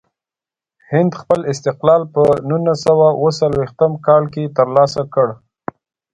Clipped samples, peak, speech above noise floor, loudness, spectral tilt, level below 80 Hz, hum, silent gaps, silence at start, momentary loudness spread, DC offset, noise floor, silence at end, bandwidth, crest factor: under 0.1%; 0 dBFS; 75 dB; -15 LUFS; -7 dB/octave; -50 dBFS; none; none; 0.9 s; 8 LU; under 0.1%; -89 dBFS; 0.8 s; 10.5 kHz; 16 dB